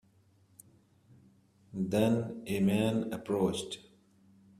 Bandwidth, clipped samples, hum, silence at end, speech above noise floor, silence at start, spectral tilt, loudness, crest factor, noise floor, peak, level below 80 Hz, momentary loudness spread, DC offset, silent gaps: 15 kHz; under 0.1%; none; 0.8 s; 35 dB; 1.75 s; -6.5 dB/octave; -32 LUFS; 20 dB; -66 dBFS; -14 dBFS; -66 dBFS; 13 LU; under 0.1%; none